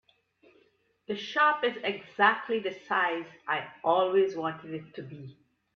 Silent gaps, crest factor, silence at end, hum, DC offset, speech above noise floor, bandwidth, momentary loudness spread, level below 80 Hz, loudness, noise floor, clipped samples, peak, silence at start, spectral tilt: none; 22 dB; 0.45 s; none; under 0.1%; 39 dB; 6.6 kHz; 17 LU; -78 dBFS; -28 LUFS; -68 dBFS; under 0.1%; -8 dBFS; 1.1 s; -5.5 dB/octave